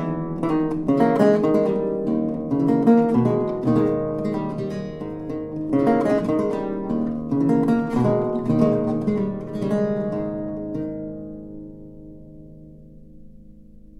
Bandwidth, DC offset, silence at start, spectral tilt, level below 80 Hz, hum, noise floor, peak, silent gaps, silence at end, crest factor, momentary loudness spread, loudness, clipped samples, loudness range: 10.5 kHz; under 0.1%; 0 s; -9.5 dB/octave; -48 dBFS; none; -44 dBFS; -4 dBFS; none; 0.1 s; 18 dB; 14 LU; -22 LUFS; under 0.1%; 10 LU